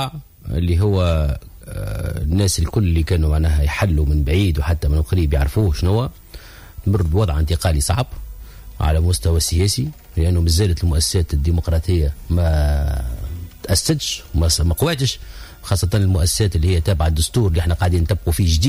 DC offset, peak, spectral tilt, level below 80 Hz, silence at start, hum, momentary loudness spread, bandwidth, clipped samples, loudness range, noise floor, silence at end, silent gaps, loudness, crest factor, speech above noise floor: under 0.1%; -4 dBFS; -5.5 dB/octave; -22 dBFS; 0 s; none; 11 LU; 16 kHz; under 0.1%; 2 LU; -38 dBFS; 0 s; none; -19 LUFS; 12 dB; 21 dB